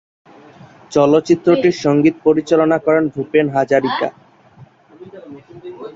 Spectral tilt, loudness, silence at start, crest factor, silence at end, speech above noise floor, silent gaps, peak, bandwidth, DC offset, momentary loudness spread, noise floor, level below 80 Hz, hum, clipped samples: -6.5 dB/octave; -15 LUFS; 0.9 s; 16 dB; 0.05 s; 31 dB; none; -2 dBFS; 7.8 kHz; under 0.1%; 20 LU; -45 dBFS; -56 dBFS; none; under 0.1%